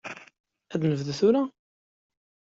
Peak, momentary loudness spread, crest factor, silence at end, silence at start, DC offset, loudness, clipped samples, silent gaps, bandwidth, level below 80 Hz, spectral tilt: -10 dBFS; 17 LU; 18 dB; 1.05 s; 0.05 s; under 0.1%; -26 LUFS; under 0.1%; 0.40-0.44 s; 7.8 kHz; -68 dBFS; -7 dB/octave